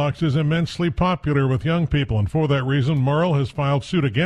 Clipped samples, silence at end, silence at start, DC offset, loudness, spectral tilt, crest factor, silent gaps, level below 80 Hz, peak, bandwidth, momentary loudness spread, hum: under 0.1%; 0 s; 0 s; under 0.1%; -21 LUFS; -7.5 dB/octave; 12 dB; none; -40 dBFS; -8 dBFS; 9.6 kHz; 2 LU; none